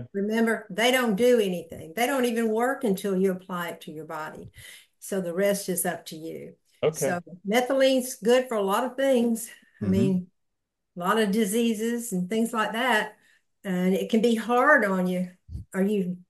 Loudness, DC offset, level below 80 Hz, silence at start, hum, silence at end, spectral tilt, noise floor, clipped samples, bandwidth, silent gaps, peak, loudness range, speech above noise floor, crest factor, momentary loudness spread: -25 LUFS; under 0.1%; -58 dBFS; 0 s; none; 0.1 s; -5 dB/octave; -82 dBFS; under 0.1%; 12.5 kHz; none; -6 dBFS; 5 LU; 57 dB; 18 dB; 14 LU